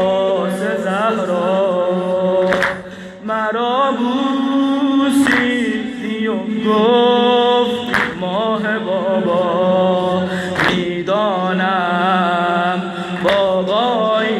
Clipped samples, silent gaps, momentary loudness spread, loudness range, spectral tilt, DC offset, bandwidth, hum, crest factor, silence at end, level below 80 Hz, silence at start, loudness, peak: under 0.1%; none; 6 LU; 2 LU; -5.5 dB/octave; under 0.1%; 13.5 kHz; none; 12 dB; 0 s; -54 dBFS; 0 s; -16 LUFS; -4 dBFS